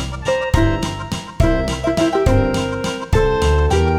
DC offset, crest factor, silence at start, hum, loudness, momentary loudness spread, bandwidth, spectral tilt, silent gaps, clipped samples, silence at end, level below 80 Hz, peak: under 0.1%; 14 dB; 0 s; none; -18 LUFS; 7 LU; 14 kHz; -6 dB/octave; none; under 0.1%; 0 s; -22 dBFS; -2 dBFS